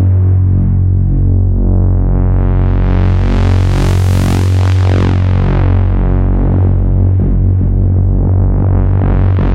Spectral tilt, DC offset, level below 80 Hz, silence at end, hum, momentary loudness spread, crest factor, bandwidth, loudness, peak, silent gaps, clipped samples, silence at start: -8.5 dB/octave; under 0.1%; -14 dBFS; 0 s; none; 2 LU; 8 dB; 7.8 kHz; -12 LUFS; -2 dBFS; none; under 0.1%; 0 s